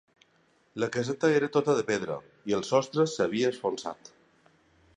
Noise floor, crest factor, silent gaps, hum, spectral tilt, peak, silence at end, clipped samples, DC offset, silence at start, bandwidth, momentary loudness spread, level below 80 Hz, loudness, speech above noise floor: -67 dBFS; 18 dB; none; none; -5 dB/octave; -10 dBFS; 1.05 s; under 0.1%; under 0.1%; 0.75 s; 10.5 kHz; 12 LU; -70 dBFS; -28 LUFS; 39 dB